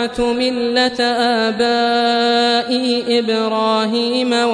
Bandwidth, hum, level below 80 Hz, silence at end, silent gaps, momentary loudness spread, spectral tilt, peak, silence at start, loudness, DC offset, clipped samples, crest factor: 10.5 kHz; none; -48 dBFS; 0 s; none; 3 LU; -3.5 dB/octave; -2 dBFS; 0 s; -16 LUFS; under 0.1%; under 0.1%; 14 dB